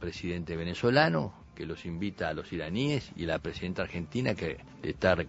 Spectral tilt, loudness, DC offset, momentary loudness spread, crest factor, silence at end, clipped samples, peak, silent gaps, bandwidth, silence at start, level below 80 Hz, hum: -6.5 dB/octave; -32 LUFS; under 0.1%; 13 LU; 24 dB; 0 s; under 0.1%; -8 dBFS; none; 8 kHz; 0 s; -52 dBFS; none